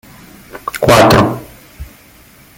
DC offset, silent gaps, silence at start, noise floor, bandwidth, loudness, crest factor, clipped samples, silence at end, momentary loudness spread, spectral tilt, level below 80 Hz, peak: under 0.1%; none; 0.55 s; -42 dBFS; 17 kHz; -10 LUFS; 14 dB; under 0.1%; 0.75 s; 20 LU; -5 dB/octave; -34 dBFS; 0 dBFS